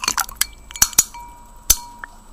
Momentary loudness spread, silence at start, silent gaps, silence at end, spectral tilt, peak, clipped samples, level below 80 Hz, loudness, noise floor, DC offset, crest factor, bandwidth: 24 LU; 0 s; none; 0.3 s; 1 dB/octave; 0 dBFS; under 0.1%; -36 dBFS; -18 LUFS; -40 dBFS; under 0.1%; 22 dB; 16.5 kHz